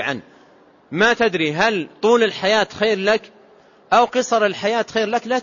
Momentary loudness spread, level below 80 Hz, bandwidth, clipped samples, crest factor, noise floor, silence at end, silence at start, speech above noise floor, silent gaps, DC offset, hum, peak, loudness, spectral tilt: 5 LU; -60 dBFS; 7.4 kHz; under 0.1%; 16 dB; -51 dBFS; 0 s; 0 s; 32 dB; none; under 0.1%; none; -4 dBFS; -18 LUFS; -4 dB/octave